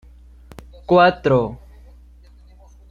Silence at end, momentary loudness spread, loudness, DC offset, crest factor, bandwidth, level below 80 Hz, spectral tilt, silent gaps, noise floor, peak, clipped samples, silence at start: 1.35 s; 24 LU; -17 LUFS; under 0.1%; 20 dB; 7.2 kHz; -44 dBFS; -8 dB/octave; none; -46 dBFS; -2 dBFS; under 0.1%; 0.9 s